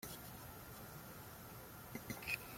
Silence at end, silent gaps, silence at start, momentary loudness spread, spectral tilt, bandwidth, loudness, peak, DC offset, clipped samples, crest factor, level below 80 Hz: 0 s; none; 0 s; 10 LU; -3.5 dB/octave; 16.5 kHz; -50 LUFS; -26 dBFS; under 0.1%; under 0.1%; 24 dB; -66 dBFS